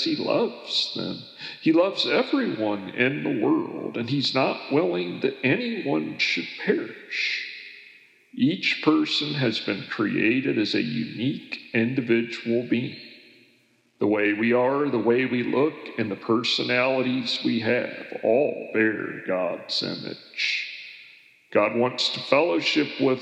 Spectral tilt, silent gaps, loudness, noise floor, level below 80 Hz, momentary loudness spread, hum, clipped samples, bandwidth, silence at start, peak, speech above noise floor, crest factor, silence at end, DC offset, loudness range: -5.5 dB/octave; none; -24 LUFS; -63 dBFS; -84 dBFS; 9 LU; none; under 0.1%; 8.4 kHz; 0 s; -6 dBFS; 38 dB; 20 dB; 0 s; under 0.1%; 3 LU